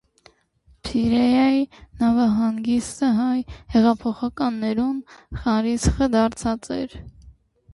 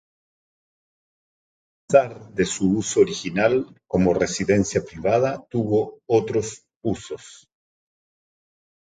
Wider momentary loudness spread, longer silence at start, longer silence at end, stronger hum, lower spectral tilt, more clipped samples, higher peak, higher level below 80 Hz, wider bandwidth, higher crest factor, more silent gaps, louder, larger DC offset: about the same, 11 LU vs 10 LU; second, 0.85 s vs 1.9 s; second, 0.45 s vs 1.45 s; neither; about the same, -6 dB/octave vs -5.5 dB/octave; neither; second, -6 dBFS vs -2 dBFS; first, -38 dBFS vs -50 dBFS; first, 11.5 kHz vs 9.6 kHz; second, 16 dB vs 22 dB; second, none vs 6.76-6.81 s; about the same, -21 LUFS vs -22 LUFS; neither